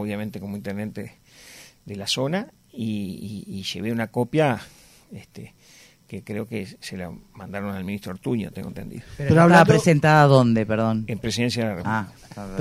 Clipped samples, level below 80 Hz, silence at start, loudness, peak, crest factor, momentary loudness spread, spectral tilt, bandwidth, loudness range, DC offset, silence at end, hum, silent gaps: under 0.1%; -52 dBFS; 0 s; -22 LUFS; -2 dBFS; 22 dB; 23 LU; -6 dB/octave; 15.5 kHz; 14 LU; under 0.1%; 0 s; none; none